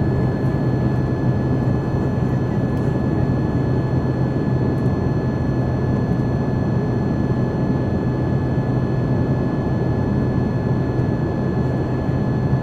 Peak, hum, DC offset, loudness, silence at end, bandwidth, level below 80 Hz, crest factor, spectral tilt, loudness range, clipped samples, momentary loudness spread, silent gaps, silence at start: -6 dBFS; none; under 0.1%; -20 LUFS; 0 s; 6.4 kHz; -34 dBFS; 12 dB; -9.5 dB/octave; 0 LU; under 0.1%; 1 LU; none; 0 s